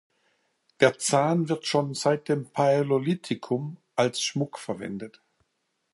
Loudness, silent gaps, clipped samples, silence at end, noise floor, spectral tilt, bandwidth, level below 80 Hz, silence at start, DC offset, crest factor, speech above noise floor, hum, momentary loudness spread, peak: -26 LUFS; none; under 0.1%; 0.85 s; -77 dBFS; -4.5 dB/octave; 11.5 kHz; -72 dBFS; 0.8 s; under 0.1%; 22 dB; 51 dB; none; 11 LU; -4 dBFS